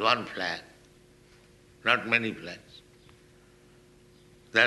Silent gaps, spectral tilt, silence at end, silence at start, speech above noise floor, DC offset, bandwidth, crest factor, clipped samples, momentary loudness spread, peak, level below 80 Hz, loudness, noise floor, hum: none; -3.5 dB/octave; 0 s; 0 s; 28 dB; under 0.1%; 12 kHz; 26 dB; under 0.1%; 17 LU; -6 dBFS; -66 dBFS; -28 LUFS; -57 dBFS; 50 Hz at -65 dBFS